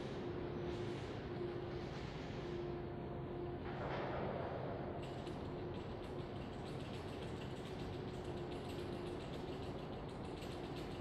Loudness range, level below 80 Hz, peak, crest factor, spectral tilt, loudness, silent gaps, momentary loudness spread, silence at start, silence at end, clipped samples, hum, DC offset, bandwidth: 2 LU; -58 dBFS; -28 dBFS; 16 dB; -7 dB/octave; -46 LUFS; none; 4 LU; 0 s; 0 s; under 0.1%; none; under 0.1%; 13 kHz